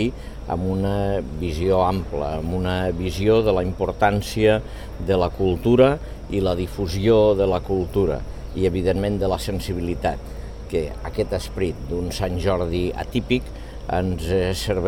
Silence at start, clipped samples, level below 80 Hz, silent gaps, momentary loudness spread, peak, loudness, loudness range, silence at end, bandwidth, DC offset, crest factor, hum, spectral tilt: 0 s; under 0.1%; -34 dBFS; none; 10 LU; -2 dBFS; -22 LUFS; 6 LU; 0 s; 17 kHz; 0.4%; 18 dB; none; -6.5 dB/octave